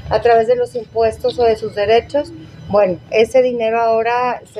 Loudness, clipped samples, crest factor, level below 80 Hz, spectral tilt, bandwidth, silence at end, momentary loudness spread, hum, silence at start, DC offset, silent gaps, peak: -16 LUFS; under 0.1%; 14 dB; -44 dBFS; -5.5 dB/octave; 12 kHz; 0 s; 8 LU; none; 0.05 s; under 0.1%; none; -2 dBFS